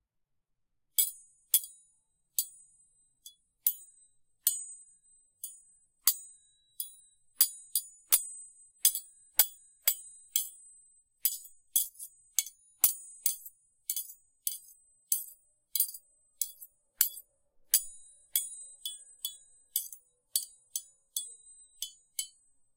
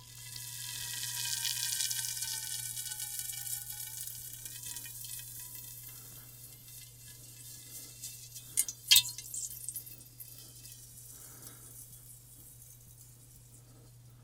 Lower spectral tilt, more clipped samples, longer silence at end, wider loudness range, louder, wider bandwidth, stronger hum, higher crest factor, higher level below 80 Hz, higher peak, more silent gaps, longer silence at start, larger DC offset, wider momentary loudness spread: second, 4.5 dB/octave vs 1 dB/octave; neither; first, 0.5 s vs 0 s; second, 7 LU vs 18 LU; about the same, -32 LUFS vs -34 LUFS; about the same, 17 kHz vs 18 kHz; neither; about the same, 32 dB vs 36 dB; second, -80 dBFS vs -66 dBFS; about the same, -4 dBFS vs -4 dBFS; neither; first, 1 s vs 0 s; neither; about the same, 18 LU vs 20 LU